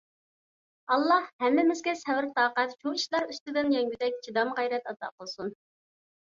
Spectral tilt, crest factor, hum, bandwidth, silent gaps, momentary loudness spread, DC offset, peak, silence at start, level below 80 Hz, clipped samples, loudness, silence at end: -3 dB/octave; 18 dB; none; 7.6 kHz; 1.33-1.39 s, 3.41-3.46 s, 5.12-5.18 s; 14 LU; under 0.1%; -12 dBFS; 0.9 s; -76 dBFS; under 0.1%; -28 LUFS; 0.85 s